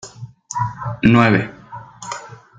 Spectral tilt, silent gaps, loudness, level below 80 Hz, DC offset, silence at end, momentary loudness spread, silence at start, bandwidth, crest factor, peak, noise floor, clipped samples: -6 dB/octave; none; -17 LUFS; -46 dBFS; under 0.1%; 0.25 s; 24 LU; 0.05 s; 9.2 kHz; 18 dB; -2 dBFS; -36 dBFS; under 0.1%